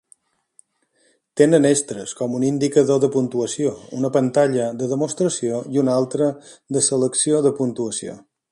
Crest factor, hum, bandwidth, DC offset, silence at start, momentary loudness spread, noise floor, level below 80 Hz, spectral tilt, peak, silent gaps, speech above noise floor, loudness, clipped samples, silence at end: 20 dB; none; 11.5 kHz; under 0.1%; 1.35 s; 10 LU; -64 dBFS; -64 dBFS; -5 dB/octave; -2 dBFS; none; 44 dB; -20 LUFS; under 0.1%; 0.35 s